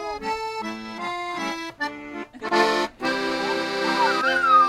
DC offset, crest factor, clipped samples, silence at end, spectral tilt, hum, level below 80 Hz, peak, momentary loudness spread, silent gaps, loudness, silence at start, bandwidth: under 0.1%; 16 dB; under 0.1%; 0 s; -3 dB/octave; none; -58 dBFS; -6 dBFS; 11 LU; none; -24 LUFS; 0 s; 15 kHz